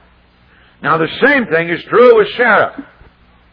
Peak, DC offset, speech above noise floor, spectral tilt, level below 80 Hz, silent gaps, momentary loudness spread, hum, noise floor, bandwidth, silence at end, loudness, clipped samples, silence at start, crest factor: 0 dBFS; under 0.1%; 37 dB; -8 dB/octave; -50 dBFS; none; 8 LU; none; -48 dBFS; 5.2 kHz; 0.7 s; -11 LUFS; 0.2%; 0.8 s; 14 dB